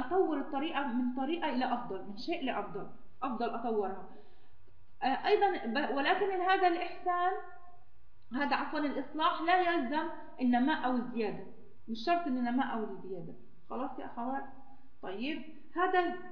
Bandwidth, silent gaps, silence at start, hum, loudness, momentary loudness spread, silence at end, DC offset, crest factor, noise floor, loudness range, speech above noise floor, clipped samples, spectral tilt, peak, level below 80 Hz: 5.4 kHz; none; 0 s; none; -33 LUFS; 15 LU; 0 s; 0.8%; 18 dB; -62 dBFS; 6 LU; 29 dB; under 0.1%; -6.5 dB/octave; -16 dBFS; -68 dBFS